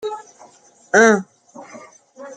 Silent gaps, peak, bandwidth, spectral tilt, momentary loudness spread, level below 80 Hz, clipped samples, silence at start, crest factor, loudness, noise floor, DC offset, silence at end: none; 0 dBFS; 9.4 kHz; -4 dB/octave; 27 LU; -66 dBFS; under 0.1%; 0.05 s; 20 dB; -15 LUFS; -49 dBFS; under 0.1%; 0 s